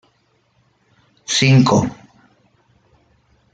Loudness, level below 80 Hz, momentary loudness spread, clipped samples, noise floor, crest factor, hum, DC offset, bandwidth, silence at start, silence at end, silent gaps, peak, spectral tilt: -15 LUFS; -52 dBFS; 16 LU; under 0.1%; -62 dBFS; 18 dB; none; under 0.1%; 9.2 kHz; 1.3 s; 1.6 s; none; -2 dBFS; -5 dB/octave